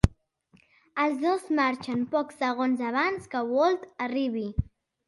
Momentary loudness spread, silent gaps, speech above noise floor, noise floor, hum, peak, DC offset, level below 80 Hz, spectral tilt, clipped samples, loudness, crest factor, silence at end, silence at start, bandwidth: 7 LU; none; 36 dB; -63 dBFS; none; -4 dBFS; under 0.1%; -42 dBFS; -7 dB/octave; under 0.1%; -28 LUFS; 24 dB; 0.45 s; 0.05 s; 11.5 kHz